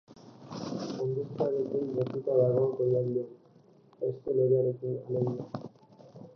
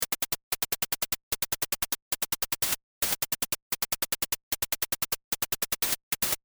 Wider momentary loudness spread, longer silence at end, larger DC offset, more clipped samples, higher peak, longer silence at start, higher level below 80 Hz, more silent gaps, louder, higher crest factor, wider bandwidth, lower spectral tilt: first, 16 LU vs 3 LU; about the same, 0.05 s vs 0.1 s; neither; neither; about the same, -14 dBFS vs -16 dBFS; about the same, 0.1 s vs 0 s; second, -72 dBFS vs -54 dBFS; second, none vs 0.43-0.51 s, 1.23-1.31 s, 2.02-2.11 s, 2.83-3.01 s, 3.62-3.71 s, 4.43-4.51 s, 5.24-5.32 s, 6.03-6.11 s; about the same, -30 LUFS vs -29 LUFS; about the same, 16 dB vs 16 dB; second, 6.6 kHz vs over 20 kHz; first, -9 dB/octave vs 0 dB/octave